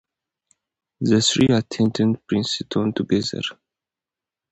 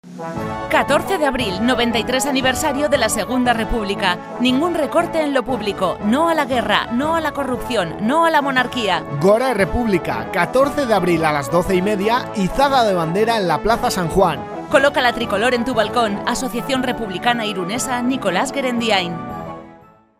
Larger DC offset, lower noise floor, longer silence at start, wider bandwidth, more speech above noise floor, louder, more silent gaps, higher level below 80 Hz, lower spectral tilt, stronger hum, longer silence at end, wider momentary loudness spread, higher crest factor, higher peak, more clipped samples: neither; first, -89 dBFS vs -46 dBFS; first, 1 s vs 0.05 s; second, 8.8 kHz vs 15.5 kHz; first, 69 dB vs 28 dB; second, -21 LUFS vs -18 LUFS; neither; second, -54 dBFS vs -38 dBFS; about the same, -5 dB/octave vs -4.5 dB/octave; neither; first, 1 s vs 0.4 s; first, 10 LU vs 6 LU; about the same, 18 dB vs 18 dB; second, -6 dBFS vs 0 dBFS; neither